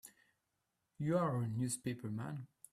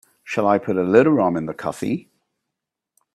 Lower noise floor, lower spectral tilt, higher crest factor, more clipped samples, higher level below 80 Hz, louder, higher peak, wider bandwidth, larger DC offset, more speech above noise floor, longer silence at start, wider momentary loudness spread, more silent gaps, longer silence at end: about the same, -86 dBFS vs -83 dBFS; about the same, -6.5 dB/octave vs -7.5 dB/octave; about the same, 18 dB vs 20 dB; neither; second, -74 dBFS vs -60 dBFS; second, -39 LUFS vs -20 LUFS; second, -22 dBFS vs 0 dBFS; first, 14.5 kHz vs 13 kHz; neither; second, 48 dB vs 65 dB; second, 0.05 s vs 0.25 s; about the same, 12 LU vs 12 LU; neither; second, 0.25 s vs 1.15 s